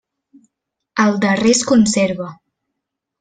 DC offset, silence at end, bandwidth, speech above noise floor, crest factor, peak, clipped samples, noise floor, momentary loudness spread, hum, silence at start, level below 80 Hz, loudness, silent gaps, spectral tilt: under 0.1%; 0.85 s; 9.4 kHz; 64 dB; 16 dB; -2 dBFS; under 0.1%; -79 dBFS; 13 LU; none; 0.95 s; -54 dBFS; -15 LUFS; none; -4 dB/octave